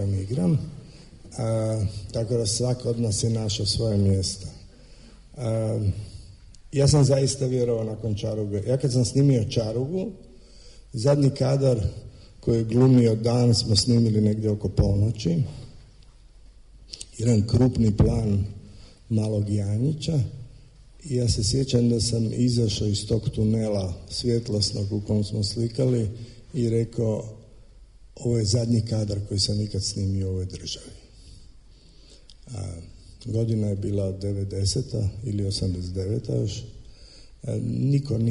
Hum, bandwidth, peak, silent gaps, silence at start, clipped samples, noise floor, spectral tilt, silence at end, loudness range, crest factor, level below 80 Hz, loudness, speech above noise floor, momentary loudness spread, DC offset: none; 11 kHz; -8 dBFS; none; 0 s; under 0.1%; -50 dBFS; -6.5 dB/octave; 0 s; 7 LU; 16 dB; -42 dBFS; -24 LUFS; 27 dB; 14 LU; under 0.1%